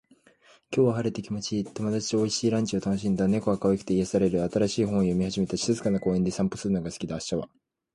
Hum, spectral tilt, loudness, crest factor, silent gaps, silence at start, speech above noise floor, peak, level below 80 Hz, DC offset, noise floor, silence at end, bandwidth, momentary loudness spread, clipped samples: none; -6 dB/octave; -27 LUFS; 16 dB; none; 0.7 s; 33 dB; -10 dBFS; -52 dBFS; under 0.1%; -59 dBFS; 0.5 s; 11.5 kHz; 6 LU; under 0.1%